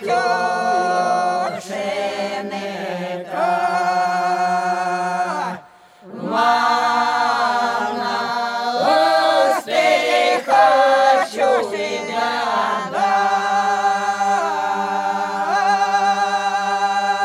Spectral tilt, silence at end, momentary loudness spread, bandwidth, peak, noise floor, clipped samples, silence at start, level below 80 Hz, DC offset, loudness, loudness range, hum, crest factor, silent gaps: -3 dB/octave; 0 s; 9 LU; 14.5 kHz; -2 dBFS; -44 dBFS; under 0.1%; 0 s; -74 dBFS; under 0.1%; -18 LUFS; 5 LU; none; 16 dB; none